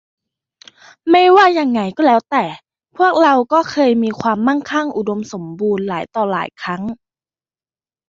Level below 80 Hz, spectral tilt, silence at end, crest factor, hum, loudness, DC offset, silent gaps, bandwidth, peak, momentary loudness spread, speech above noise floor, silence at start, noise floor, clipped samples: -60 dBFS; -5.5 dB/octave; 1.15 s; 16 dB; none; -15 LUFS; under 0.1%; none; 7.6 kHz; 0 dBFS; 14 LU; over 75 dB; 1.05 s; under -90 dBFS; under 0.1%